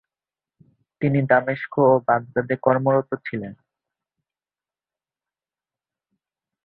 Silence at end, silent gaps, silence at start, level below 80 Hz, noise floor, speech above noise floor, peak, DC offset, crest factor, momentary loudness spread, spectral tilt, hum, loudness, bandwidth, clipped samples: 3.1 s; none; 1 s; -64 dBFS; under -90 dBFS; over 70 dB; -2 dBFS; under 0.1%; 22 dB; 12 LU; -12 dB/octave; none; -21 LUFS; 4.4 kHz; under 0.1%